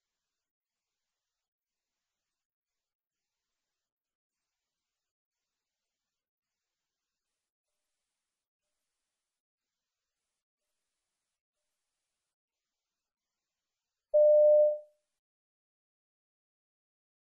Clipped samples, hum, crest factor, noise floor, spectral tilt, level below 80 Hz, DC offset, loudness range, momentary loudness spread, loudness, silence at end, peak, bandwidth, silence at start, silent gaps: under 0.1%; none; 20 dB; under -90 dBFS; -5 dB/octave; under -90 dBFS; under 0.1%; 2 LU; 10 LU; -24 LUFS; 2.45 s; -18 dBFS; 1 kHz; 14.15 s; none